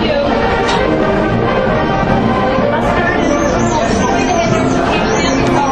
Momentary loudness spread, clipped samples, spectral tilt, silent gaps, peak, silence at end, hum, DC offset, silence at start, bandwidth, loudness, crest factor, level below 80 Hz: 1 LU; under 0.1%; -5.5 dB/octave; none; 0 dBFS; 0 s; none; under 0.1%; 0 s; 9.6 kHz; -13 LUFS; 12 dB; -28 dBFS